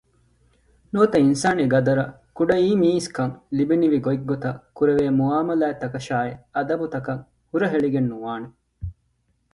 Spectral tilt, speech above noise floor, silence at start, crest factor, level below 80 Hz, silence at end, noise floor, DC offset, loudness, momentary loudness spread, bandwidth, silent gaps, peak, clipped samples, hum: -7 dB/octave; 47 dB; 0.95 s; 18 dB; -52 dBFS; 0.6 s; -68 dBFS; under 0.1%; -22 LUFS; 13 LU; 11.5 kHz; none; -4 dBFS; under 0.1%; none